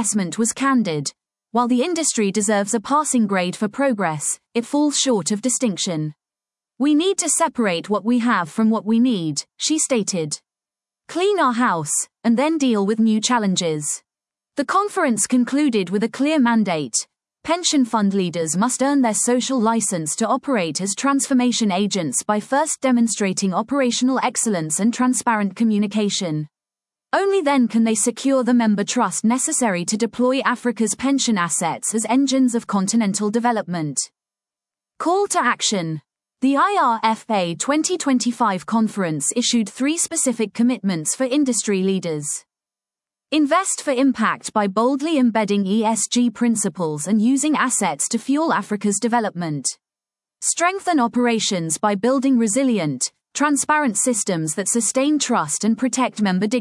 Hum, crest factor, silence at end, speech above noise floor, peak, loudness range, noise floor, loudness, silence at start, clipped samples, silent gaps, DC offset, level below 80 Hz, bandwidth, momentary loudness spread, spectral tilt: none; 16 dB; 0 s; over 71 dB; -4 dBFS; 2 LU; under -90 dBFS; -19 LUFS; 0 s; under 0.1%; none; under 0.1%; -70 dBFS; 12 kHz; 6 LU; -3.5 dB/octave